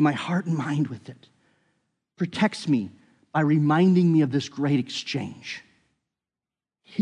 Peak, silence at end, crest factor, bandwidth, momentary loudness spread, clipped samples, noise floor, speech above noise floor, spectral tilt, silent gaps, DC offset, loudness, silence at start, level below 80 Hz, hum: -8 dBFS; 0 s; 18 dB; 10.5 kHz; 17 LU; under 0.1%; under -90 dBFS; over 67 dB; -7 dB/octave; none; under 0.1%; -24 LUFS; 0 s; -72 dBFS; none